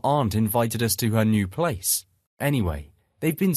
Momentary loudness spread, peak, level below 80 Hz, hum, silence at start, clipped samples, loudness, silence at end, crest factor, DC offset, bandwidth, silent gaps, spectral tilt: 7 LU; -6 dBFS; -46 dBFS; none; 0.05 s; under 0.1%; -24 LUFS; 0 s; 18 dB; under 0.1%; 14.5 kHz; 2.26-2.37 s; -5 dB/octave